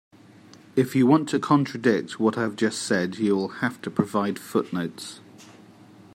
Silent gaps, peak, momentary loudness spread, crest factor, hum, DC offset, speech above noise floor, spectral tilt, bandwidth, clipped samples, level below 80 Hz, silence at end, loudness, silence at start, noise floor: none; -6 dBFS; 10 LU; 20 dB; none; under 0.1%; 26 dB; -6 dB/octave; 16 kHz; under 0.1%; -70 dBFS; 0.65 s; -24 LUFS; 0.75 s; -50 dBFS